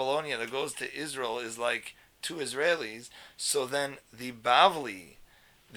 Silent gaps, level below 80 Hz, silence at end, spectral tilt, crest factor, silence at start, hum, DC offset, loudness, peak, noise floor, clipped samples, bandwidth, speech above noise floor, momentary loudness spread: none; -70 dBFS; 0 s; -2 dB/octave; 24 dB; 0 s; none; under 0.1%; -30 LUFS; -8 dBFS; -59 dBFS; under 0.1%; over 20 kHz; 28 dB; 18 LU